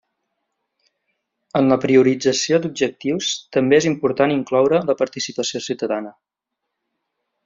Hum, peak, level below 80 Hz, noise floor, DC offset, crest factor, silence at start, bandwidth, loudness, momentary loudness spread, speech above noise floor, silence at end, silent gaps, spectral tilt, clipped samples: none; -2 dBFS; -62 dBFS; -80 dBFS; under 0.1%; 18 dB; 1.55 s; 7.8 kHz; -19 LUFS; 9 LU; 62 dB; 1.35 s; none; -4.5 dB/octave; under 0.1%